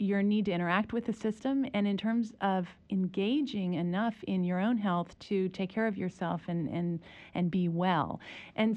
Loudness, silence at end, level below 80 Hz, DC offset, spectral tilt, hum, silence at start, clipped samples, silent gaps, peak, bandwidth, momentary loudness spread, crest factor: -32 LUFS; 0 s; -66 dBFS; under 0.1%; -8 dB/octave; none; 0 s; under 0.1%; none; -16 dBFS; 8.4 kHz; 6 LU; 16 dB